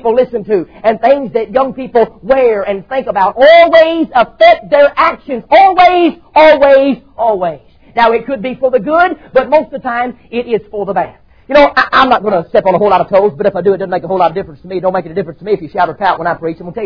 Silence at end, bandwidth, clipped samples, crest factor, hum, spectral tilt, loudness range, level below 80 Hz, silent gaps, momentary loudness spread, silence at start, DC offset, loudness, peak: 0 s; 5.4 kHz; 0.5%; 10 dB; none; -7 dB/octave; 6 LU; -42 dBFS; none; 11 LU; 0.05 s; 0.4%; -11 LUFS; 0 dBFS